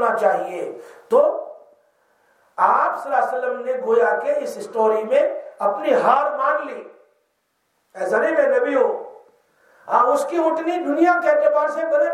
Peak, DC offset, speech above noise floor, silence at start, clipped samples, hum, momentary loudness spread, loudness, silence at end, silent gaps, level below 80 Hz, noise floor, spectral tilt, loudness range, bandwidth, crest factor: -2 dBFS; under 0.1%; 51 dB; 0 s; under 0.1%; none; 13 LU; -19 LUFS; 0 s; none; -82 dBFS; -70 dBFS; -4.5 dB/octave; 2 LU; 13.5 kHz; 18 dB